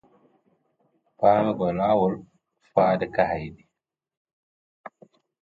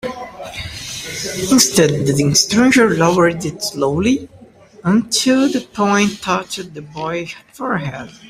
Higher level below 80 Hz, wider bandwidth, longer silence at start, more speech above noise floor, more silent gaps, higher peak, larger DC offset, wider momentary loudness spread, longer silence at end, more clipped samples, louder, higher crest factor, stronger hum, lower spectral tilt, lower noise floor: second, -56 dBFS vs -48 dBFS; second, 4.8 kHz vs 16 kHz; first, 1.2 s vs 0.05 s; first, 61 dB vs 27 dB; first, 4.17-4.25 s, 4.33-4.84 s vs none; second, -4 dBFS vs 0 dBFS; neither; second, 10 LU vs 15 LU; first, 0.55 s vs 0 s; neither; second, -23 LUFS vs -15 LUFS; first, 22 dB vs 16 dB; neither; first, -9 dB/octave vs -4 dB/octave; first, -83 dBFS vs -43 dBFS